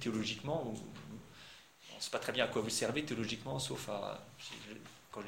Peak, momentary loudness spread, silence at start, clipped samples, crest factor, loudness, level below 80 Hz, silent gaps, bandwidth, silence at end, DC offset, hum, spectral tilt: -16 dBFS; 18 LU; 0 s; under 0.1%; 24 dB; -39 LUFS; -68 dBFS; none; 16.5 kHz; 0 s; under 0.1%; none; -3.5 dB/octave